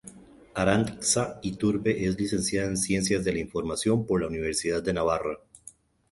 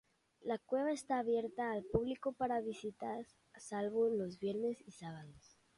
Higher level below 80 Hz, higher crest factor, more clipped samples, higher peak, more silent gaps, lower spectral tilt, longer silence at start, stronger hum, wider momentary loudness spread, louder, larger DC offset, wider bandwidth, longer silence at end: first, -50 dBFS vs -66 dBFS; about the same, 20 dB vs 20 dB; neither; first, -6 dBFS vs -20 dBFS; neither; second, -4.5 dB/octave vs -6 dB/octave; second, 0.05 s vs 0.45 s; neither; second, 6 LU vs 14 LU; first, -27 LUFS vs -39 LUFS; neither; about the same, 12 kHz vs 11.5 kHz; about the same, 0.4 s vs 0.4 s